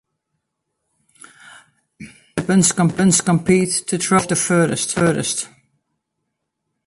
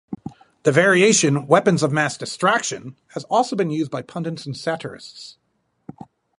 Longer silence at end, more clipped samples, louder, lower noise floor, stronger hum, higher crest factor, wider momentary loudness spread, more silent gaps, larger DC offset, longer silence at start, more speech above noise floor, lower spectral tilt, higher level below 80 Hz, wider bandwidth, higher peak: first, 1.4 s vs 1.1 s; neither; about the same, -17 LUFS vs -19 LUFS; first, -76 dBFS vs -44 dBFS; neither; about the same, 18 dB vs 20 dB; second, 10 LU vs 20 LU; neither; neither; first, 1.5 s vs 0.1 s; first, 59 dB vs 24 dB; about the same, -4.5 dB/octave vs -4 dB/octave; first, -54 dBFS vs -64 dBFS; about the same, 11.5 kHz vs 11.5 kHz; about the same, -2 dBFS vs -2 dBFS